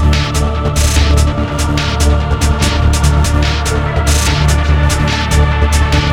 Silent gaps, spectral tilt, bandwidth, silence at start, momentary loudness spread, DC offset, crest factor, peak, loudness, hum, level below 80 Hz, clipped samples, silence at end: none; -4.5 dB/octave; 15.5 kHz; 0 s; 3 LU; under 0.1%; 10 dB; 0 dBFS; -13 LUFS; none; -14 dBFS; under 0.1%; 0 s